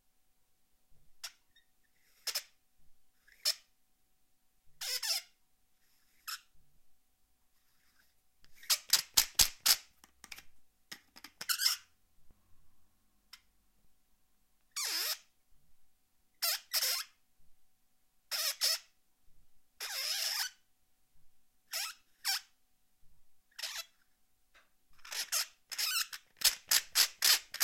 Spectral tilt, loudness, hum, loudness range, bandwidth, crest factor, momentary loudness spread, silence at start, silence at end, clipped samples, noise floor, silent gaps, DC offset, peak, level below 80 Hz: 3 dB/octave; -32 LUFS; none; 11 LU; 16.5 kHz; 32 dB; 21 LU; 0.9 s; 0 s; under 0.1%; -76 dBFS; none; under 0.1%; -8 dBFS; -66 dBFS